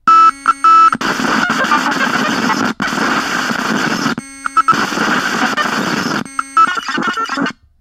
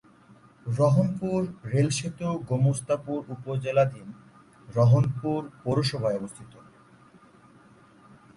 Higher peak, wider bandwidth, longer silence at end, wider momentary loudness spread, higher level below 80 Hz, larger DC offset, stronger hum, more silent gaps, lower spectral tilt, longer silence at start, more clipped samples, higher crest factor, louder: first, 0 dBFS vs -10 dBFS; first, 16 kHz vs 11.5 kHz; second, 0.3 s vs 1.9 s; second, 9 LU vs 12 LU; first, -52 dBFS vs -58 dBFS; neither; neither; neither; second, -3 dB/octave vs -7 dB/octave; second, 0.05 s vs 0.65 s; neither; about the same, 14 dB vs 18 dB; first, -13 LUFS vs -26 LUFS